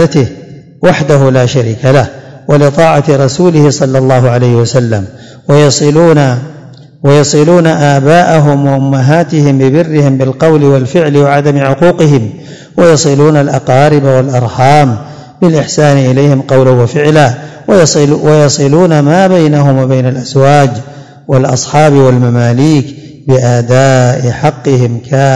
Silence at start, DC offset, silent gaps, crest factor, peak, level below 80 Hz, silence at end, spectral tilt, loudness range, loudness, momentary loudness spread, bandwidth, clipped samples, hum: 0 s; 1%; none; 6 dB; 0 dBFS; -42 dBFS; 0 s; -6.5 dB/octave; 2 LU; -7 LUFS; 6 LU; 10.5 kHz; 8%; none